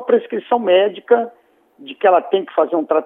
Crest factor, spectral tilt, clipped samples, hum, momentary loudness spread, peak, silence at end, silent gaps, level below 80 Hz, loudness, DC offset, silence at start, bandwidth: 16 dB; -8 dB/octave; under 0.1%; none; 5 LU; -2 dBFS; 0 s; none; -82 dBFS; -16 LUFS; under 0.1%; 0 s; 3.8 kHz